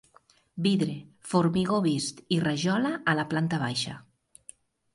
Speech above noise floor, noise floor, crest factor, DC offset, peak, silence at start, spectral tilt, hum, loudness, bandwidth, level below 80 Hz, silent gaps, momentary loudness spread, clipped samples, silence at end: 35 dB; -62 dBFS; 20 dB; under 0.1%; -10 dBFS; 0.55 s; -5.5 dB/octave; none; -27 LUFS; 11.5 kHz; -64 dBFS; none; 8 LU; under 0.1%; 0.95 s